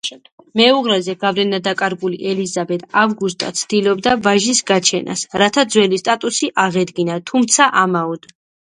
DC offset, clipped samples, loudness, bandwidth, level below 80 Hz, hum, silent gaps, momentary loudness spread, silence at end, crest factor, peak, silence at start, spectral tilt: under 0.1%; under 0.1%; -16 LUFS; 11.5 kHz; -58 dBFS; none; 0.32-0.38 s; 9 LU; 0.55 s; 16 dB; 0 dBFS; 0.05 s; -3 dB/octave